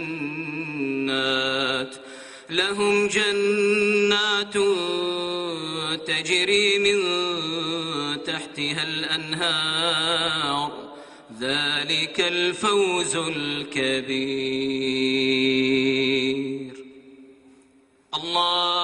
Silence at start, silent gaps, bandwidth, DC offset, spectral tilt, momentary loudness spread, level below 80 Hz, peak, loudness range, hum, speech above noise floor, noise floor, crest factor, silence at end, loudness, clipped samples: 0 s; none; 11 kHz; under 0.1%; -3 dB/octave; 10 LU; -62 dBFS; -8 dBFS; 2 LU; none; 35 dB; -58 dBFS; 16 dB; 0 s; -22 LUFS; under 0.1%